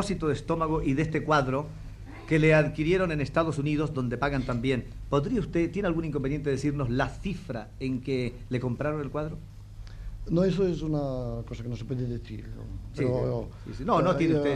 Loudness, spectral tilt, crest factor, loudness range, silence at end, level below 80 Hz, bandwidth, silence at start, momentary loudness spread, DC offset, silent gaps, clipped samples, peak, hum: -28 LUFS; -7.5 dB/octave; 18 dB; 5 LU; 0 s; -42 dBFS; 11 kHz; 0 s; 16 LU; under 0.1%; none; under 0.1%; -10 dBFS; none